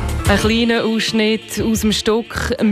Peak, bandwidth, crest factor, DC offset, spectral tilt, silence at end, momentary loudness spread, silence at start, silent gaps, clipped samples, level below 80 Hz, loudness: -4 dBFS; 15.5 kHz; 12 dB; under 0.1%; -4.5 dB/octave; 0 s; 5 LU; 0 s; none; under 0.1%; -30 dBFS; -17 LUFS